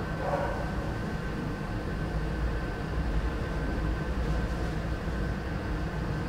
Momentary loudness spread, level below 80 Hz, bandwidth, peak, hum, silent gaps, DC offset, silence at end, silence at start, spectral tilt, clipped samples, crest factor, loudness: 3 LU; -34 dBFS; 12 kHz; -16 dBFS; none; none; under 0.1%; 0 s; 0 s; -7 dB/octave; under 0.1%; 14 dB; -33 LUFS